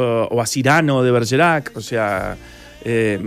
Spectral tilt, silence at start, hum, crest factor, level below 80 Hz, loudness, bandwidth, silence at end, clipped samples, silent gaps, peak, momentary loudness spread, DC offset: -5 dB/octave; 0 s; none; 16 dB; -46 dBFS; -17 LUFS; 15.5 kHz; 0 s; under 0.1%; none; -2 dBFS; 11 LU; under 0.1%